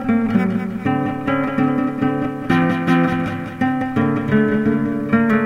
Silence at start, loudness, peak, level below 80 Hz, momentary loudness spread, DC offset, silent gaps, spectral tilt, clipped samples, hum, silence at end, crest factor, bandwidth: 0 s; -19 LUFS; -4 dBFS; -46 dBFS; 4 LU; under 0.1%; none; -8.5 dB/octave; under 0.1%; none; 0 s; 14 dB; 10 kHz